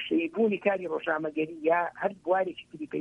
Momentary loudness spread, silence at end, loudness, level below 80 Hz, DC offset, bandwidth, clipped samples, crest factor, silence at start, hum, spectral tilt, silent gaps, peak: 7 LU; 0 s; -29 LUFS; -72 dBFS; under 0.1%; 6.6 kHz; under 0.1%; 18 dB; 0 s; none; -7 dB/octave; none; -12 dBFS